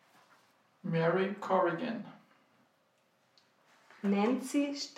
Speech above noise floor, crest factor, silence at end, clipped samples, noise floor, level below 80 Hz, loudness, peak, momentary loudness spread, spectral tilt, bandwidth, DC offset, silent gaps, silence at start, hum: 41 dB; 18 dB; 0.05 s; under 0.1%; -72 dBFS; -90 dBFS; -33 LUFS; -16 dBFS; 12 LU; -6 dB/octave; 14.5 kHz; under 0.1%; none; 0.85 s; none